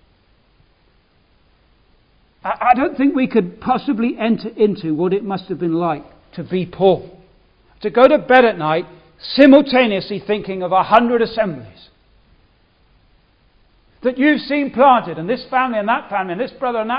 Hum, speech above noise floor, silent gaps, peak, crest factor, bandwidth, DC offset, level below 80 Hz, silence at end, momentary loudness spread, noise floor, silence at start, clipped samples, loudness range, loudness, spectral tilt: none; 40 dB; none; 0 dBFS; 18 dB; 5.4 kHz; under 0.1%; -54 dBFS; 0 s; 12 LU; -56 dBFS; 2.45 s; under 0.1%; 7 LU; -16 LUFS; -8.5 dB/octave